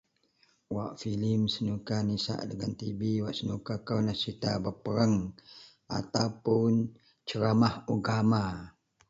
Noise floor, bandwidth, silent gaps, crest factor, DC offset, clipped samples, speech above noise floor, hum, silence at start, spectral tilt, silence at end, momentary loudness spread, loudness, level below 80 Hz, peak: -69 dBFS; 7.8 kHz; none; 18 dB; under 0.1%; under 0.1%; 39 dB; none; 0.7 s; -6.5 dB/octave; 0.4 s; 11 LU; -31 LUFS; -58 dBFS; -14 dBFS